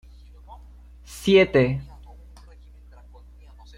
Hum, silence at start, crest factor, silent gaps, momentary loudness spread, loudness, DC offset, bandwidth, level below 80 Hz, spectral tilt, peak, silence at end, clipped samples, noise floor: none; 0.5 s; 20 dB; none; 26 LU; -20 LUFS; under 0.1%; 15 kHz; -44 dBFS; -6 dB/octave; -6 dBFS; 1.95 s; under 0.1%; -46 dBFS